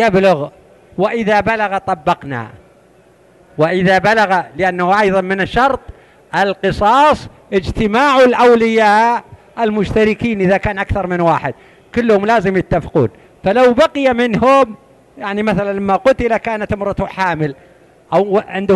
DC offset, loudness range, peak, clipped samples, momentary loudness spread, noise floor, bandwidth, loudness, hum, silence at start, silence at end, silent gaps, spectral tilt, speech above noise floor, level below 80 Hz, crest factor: under 0.1%; 5 LU; -2 dBFS; under 0.1%; 10 LU; -48 dBFS; 12 kHz; -14 LUFS; none; 0 s; 0 s; none; -6.5 dB/octave; 34 dB; -38 dBFS; 12 dB